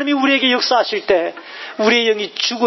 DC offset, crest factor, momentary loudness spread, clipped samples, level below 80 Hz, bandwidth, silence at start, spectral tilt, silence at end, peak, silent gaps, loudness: under 0.1%; 14 dB; 11 LU; under 0.1%; -62 dBFS; 6.2 kHz; 0 s; -2.5 dB/octave; 0 s; -2 dBFS; none; -16 LUFS